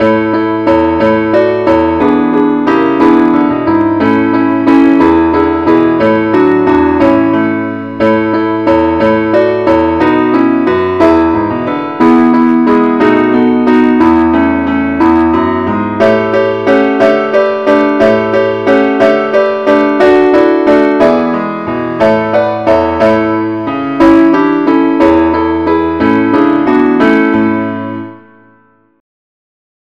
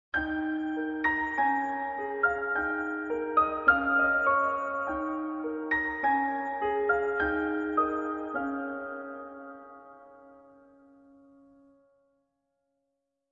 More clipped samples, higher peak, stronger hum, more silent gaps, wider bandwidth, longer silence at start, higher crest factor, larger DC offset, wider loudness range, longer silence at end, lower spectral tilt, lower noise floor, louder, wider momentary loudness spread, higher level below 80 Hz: neither; first, 0 dBFS vs -8 dBFS; neither; neither; about the same, 6.6 kHz vs 7 kHz; second, 0 s vs 0.15 s; second, 8 dB vs 22 dB; first, 0.4% vs under 0.1%; second, 2 LU vs 13 LU; second, 1.8 s vs 2.9 s; first, -7.5 dB/octave vs -3 dB/octave; second, -48 dBFS vs -82 dBFS; first, -9 LUFS vs -29 LUFS; second, 5 LU vs 13 LU; first, -38 dBFS vs -58 dBFS